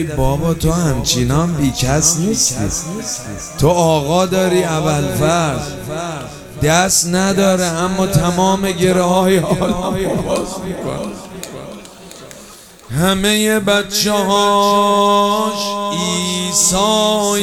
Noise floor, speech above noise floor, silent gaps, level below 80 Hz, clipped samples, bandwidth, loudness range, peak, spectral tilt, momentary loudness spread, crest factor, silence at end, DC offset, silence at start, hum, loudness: -39 dBFS; 24 dB; none; -34 dBFS; under 0.1%; 17.5 kHz; 6 LU; 0 dBFS; -4 dB/octave; 13 LU; 16 dB; 0 s; 0.2%; 0 s; none; -15 LUFS